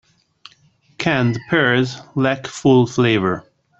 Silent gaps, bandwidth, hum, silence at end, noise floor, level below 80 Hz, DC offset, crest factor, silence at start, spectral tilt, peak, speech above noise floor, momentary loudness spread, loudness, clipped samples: none; 8.2 kHz; none; 0.4 s; -56 dBFS; -54 dBFS; under 0.1%; 16 dB; 1 s; -6 dB/octave; -2 dBFS; 39 dB; 8 LU; -18 LUFS; under 0.1%